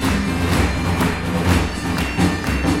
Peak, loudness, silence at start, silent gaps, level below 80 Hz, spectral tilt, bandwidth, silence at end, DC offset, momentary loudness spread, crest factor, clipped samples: -2 dBFS; -19 LUFS; 0 s; none; -28 dBFS; -5.5 dB/octave; 17 kHz; 0 s; under 0.1%; 3 LU; 16 dB; under 0.1%